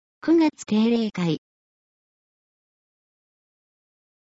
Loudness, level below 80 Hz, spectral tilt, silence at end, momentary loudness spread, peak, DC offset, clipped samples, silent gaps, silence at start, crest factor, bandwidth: -22 LUFS; -70 dBFS; -6.5 dB/octave; 2.9 s; 7 LU; -12 dBFS; under 0.1%; under 0.1%; none; 0.25 s; 16 dB; 8 kHz